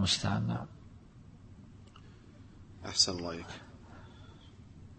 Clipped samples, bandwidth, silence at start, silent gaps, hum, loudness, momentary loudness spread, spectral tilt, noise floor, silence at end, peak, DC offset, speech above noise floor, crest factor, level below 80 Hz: under 0.1%; 8.4 kHz; 0 s; none; none; -32 LUFS; 27 LU; -3.5 dB/octave; -54 dBFS; 0 s; -14 dBFS; under 0.1%; 21 dB; 24 dB; -58 dBFS